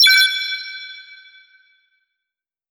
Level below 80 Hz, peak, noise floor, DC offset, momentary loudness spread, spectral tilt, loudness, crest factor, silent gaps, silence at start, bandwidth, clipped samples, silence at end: -86 dBFS; -4 dBFS; -86 dBFS; under 0.1%; 24 LU; 7 dB/octave; -15 LUFS; 18 dB; none; 0 s; over 20 kHz; under 0.1%; 1.7 s